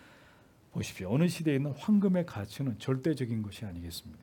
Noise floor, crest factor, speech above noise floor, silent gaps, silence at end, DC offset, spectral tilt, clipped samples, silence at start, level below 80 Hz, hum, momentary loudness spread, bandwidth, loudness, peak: -60 dBFS; 16 dB; 29 dB; none; 0.05 s; under 0.1%; -7 dB/octave; under 0.1%; 0.75 s; -64 dBFS; none; 14 LU; 18 kHz; -32 LUFS; -16 dBFS